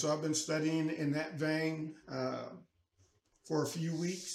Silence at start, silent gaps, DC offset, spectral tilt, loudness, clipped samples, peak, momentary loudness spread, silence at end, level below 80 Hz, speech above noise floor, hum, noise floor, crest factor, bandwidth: 0 s; none; under 0.1%; -5 dB/octave; -36 LUFS; under 0.1%; -22 dBFS; 9 LU; 0 s; -78 dBFS; 37 dB; none; -72 dBFS; 16 dB; 14.5 kHz